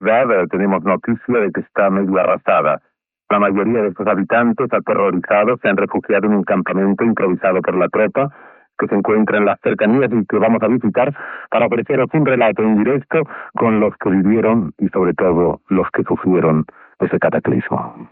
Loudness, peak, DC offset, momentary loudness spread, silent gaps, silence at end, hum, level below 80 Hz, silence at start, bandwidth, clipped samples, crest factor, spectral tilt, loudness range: -16 LUFS; -2 dBFS; under 0.1%; 5 LU; none; 0.05 s; none; -52 dBFS; 0 s; 4 kHz; under 0.1%; 14 dB; -12.5 dB/octave; 1 LU